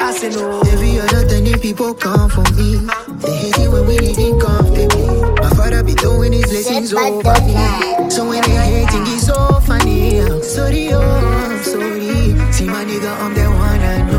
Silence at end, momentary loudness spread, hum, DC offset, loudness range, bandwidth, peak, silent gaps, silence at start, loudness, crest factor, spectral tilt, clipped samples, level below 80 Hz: 0 s; 5 LU; none; under 0.1%; 2 LU; 16.5 kHz; 0 dBFS; none; 0 s; -14 LUFS; 12 dB; -5.5 dB/octave; under 0.1%; -16 dBFS